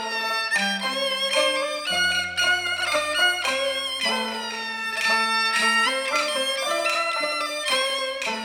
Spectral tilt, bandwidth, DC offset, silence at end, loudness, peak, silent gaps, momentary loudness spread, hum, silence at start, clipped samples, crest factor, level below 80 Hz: -0.5 dB/octave; over 20 kHz; under 0.1%; 0 s; -22 LUFS; -8 dBFS; none; 5 LU; none; 0 s; under 0.1%; 16 dB; -64 dBFS